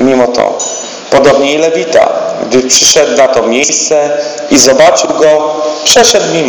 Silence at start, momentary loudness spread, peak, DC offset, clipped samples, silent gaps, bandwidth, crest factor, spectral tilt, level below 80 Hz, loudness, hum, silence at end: 0 s; 9 LU; 0 dBFS; under 0.1%; 4%; none; over 20 kHz; 8 dB; -2 dB/octave; -44 dBFS; -7 LUFS; none; 0 s